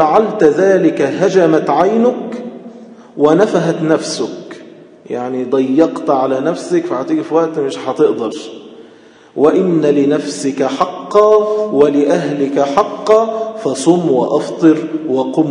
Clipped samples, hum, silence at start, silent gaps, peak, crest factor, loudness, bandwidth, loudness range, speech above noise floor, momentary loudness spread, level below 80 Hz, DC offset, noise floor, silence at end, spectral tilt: 0.3%; none; 0 s; none; 0 dBFS; 14 dB; -13 LUFS; 10.5 kHz; 4 LU; 29 dB; 12 LU; -60 dBFS; under 0.1%; -42 dBFS; 0 s; -6 dB/octave